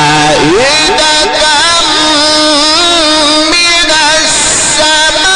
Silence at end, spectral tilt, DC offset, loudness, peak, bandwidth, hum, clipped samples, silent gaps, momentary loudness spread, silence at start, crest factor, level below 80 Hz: 0 s; -1 dB/octave; under 0.1%; -5 LUFS; 0 dBFS; 11.5 kHz; none; under 0.1%; none; 1 LU; 0 s; 8 dB; -32 dBFS